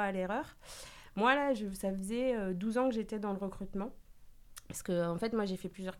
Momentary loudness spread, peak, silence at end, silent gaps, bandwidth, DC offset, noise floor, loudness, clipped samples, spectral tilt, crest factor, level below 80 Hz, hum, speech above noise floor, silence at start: 16 LU; -14 dBFS; 0 s; none; 16.5 kHz; under 0.1%; -54 dBFS; -35 LUFS; under 0.1%; -5.5 dB/octave; 22 dB; -56 dBFS; none; 20 dB; 0 s